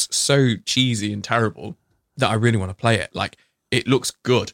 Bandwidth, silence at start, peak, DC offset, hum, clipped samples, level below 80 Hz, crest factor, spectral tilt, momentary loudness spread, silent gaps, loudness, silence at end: 16.5 kHz; 0 s; -2 dBFS; under 0.1%; none; under 0.1%; -58 dBFS; 18 dB; -4.5 dB/octave; 9 LU; none; -21 LUFS; 0.05 s